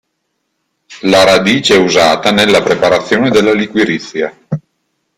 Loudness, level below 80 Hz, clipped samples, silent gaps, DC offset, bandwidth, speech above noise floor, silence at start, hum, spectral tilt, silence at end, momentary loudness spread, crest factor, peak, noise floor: -10 LUFS; -46 dBFS; under 0.1%; none; under 0.1%; 16 kHz; 58 dB; 0.9 s; none; -4 dB/octave; 0.6 s; 12 LU; 12 dB; 0 dBFS; -68 dBFS